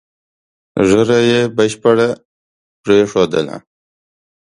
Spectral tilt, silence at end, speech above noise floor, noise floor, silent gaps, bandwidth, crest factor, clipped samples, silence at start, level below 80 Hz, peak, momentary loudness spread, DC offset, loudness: -5.5 dB/octave; 1 s; over 77 dB; under -90 dBFS; 2.25-2.83 s; 11.5 kHz; 16 dB; under 0.1%; 0.75 s; -50 dBFS; 0 dBFS; 14 LU; under 0.1%; -13 LUFS